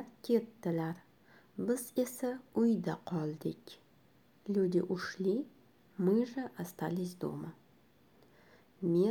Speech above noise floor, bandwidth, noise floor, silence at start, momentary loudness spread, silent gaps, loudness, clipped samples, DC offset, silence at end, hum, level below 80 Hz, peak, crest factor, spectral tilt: 32 dB; 19.5 kHz; -66 dBFS; 0 s; 18 LU; none; -35 LUFS; under 0.1%; under 0.1%; 0 s; none; -78 dBFS; -18 dBFS; 16 dB; -7 dB/octave